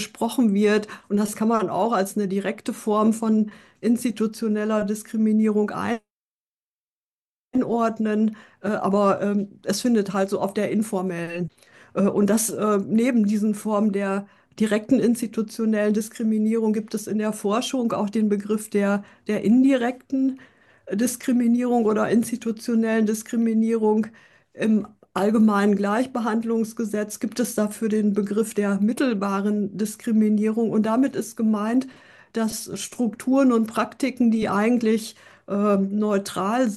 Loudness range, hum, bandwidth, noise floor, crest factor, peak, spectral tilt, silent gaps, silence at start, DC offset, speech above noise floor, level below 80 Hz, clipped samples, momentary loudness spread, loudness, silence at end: 2 LU; none; 12.5 kHz; under -90 dBFS; 14 dB; -8 dBFS; -6 dB/octave; 6.12-7.48 s; 0 s; under 0.1%; over 68 dB; -66 dBFS; under 0.1%; 7 LU; -23 LUFS; 0 s